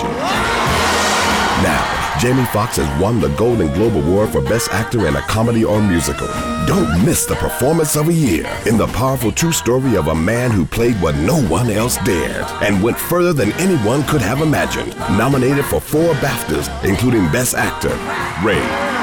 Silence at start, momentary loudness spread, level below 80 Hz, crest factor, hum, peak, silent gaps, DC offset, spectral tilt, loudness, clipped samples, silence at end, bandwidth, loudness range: 0 s; 4 LU; -32 dBFS; 10 dB; none; -6 dBFS; none; under 0.1%; -5 dB/octave; -16 LUFS; under 0.1%; 0 s; over 20 kHz; 1 LU